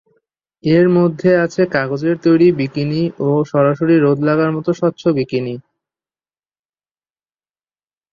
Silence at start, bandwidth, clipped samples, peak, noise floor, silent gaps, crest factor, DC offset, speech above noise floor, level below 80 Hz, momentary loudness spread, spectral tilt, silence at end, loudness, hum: 0.65 s; 7.2 kHz; under 0.1%; -2 dBFS; under -90 dBFS; none; 14 dB; under 0.1%; over 76 dB; -58 dBFS; 7 LU; -8 dB/octave; 2.5 s; -15 LUFS; none